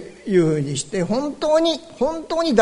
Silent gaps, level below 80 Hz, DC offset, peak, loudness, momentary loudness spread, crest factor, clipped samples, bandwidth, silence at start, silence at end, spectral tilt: none; -50 dBFS; under 0.1%; -2 dBFS; -21 LUFS; 6 LU; 18 dB; under 0.1%; 11 kHz; 0 s; 0 s; -5.5 dB/octave